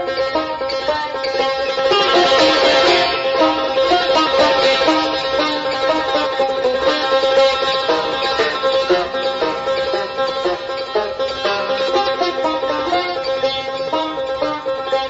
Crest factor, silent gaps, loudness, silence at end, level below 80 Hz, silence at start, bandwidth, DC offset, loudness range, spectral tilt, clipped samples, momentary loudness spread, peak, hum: 14 dB; none; -16 LUFS; 0 s; -48 dBFS; 0 s; 8 kHz; under 0.1%; 5 LU; -3 dB/octave; under 0.1%; 8 LU; -4 dBFS; none